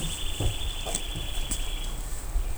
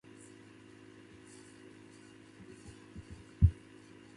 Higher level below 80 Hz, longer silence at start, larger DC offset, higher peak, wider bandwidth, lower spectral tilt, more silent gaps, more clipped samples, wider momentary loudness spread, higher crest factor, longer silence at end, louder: first, -32 dBFS vs -44 dBFS; second, 0 s vs 2.95 s; neither; first, -8 dBFS vs -12 dBFS; first, over 20 kHz vs 11 kHz; second, -3 dB/octave vs -7.5 dB/octave; neither; neither; second, 5 LU vs 25 LU; second, 20 dB vs 26 dB; second, 0 s vs 0.65 s; about the same, -32 LUFS vs -31 LUFS